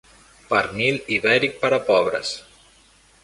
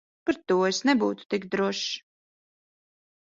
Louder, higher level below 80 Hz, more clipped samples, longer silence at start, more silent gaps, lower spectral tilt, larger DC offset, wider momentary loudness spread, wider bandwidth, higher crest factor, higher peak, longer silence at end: first, -20 LUFS vs -26 LUFS; first, -56 dBFS vs -70 dBFS; neither; first, 0.5 s vs 0.25 s; second, none vs 1.25-1.29 s; about the same, -4 dB/octave vs -4 dB/octave; neither; about the same, 8 LU vs 9 LU; first, 11.5 kHz vs 7.8 kHz; about the same, 20 dB vs 20 dB; first, -2 dBFS vs -8 dBFS; second, 0.85 s vs 1.3 s